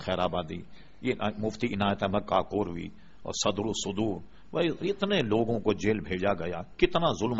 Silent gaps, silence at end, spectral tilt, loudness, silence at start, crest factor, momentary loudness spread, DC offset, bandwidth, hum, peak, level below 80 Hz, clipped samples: none; 0 s; -4.5 dB/octave; -29 LUFS; 0 s; 20 dB; 10 LU; 0.5%; 8 kHz; none; -10 dBFS; -50 dBFS; under 0.1%